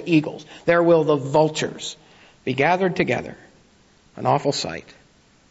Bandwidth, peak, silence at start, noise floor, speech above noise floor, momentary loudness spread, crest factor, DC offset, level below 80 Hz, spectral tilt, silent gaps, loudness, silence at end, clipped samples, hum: 8 kHz; -6 dBFS; 0 s; -56 dBFS; 35 dB; 16 LU; 16 dB; under 0.1%; -58 dBFS; -5.5 dB/octave; none; -21 LUFS; 0.7 s; under 0.1%; none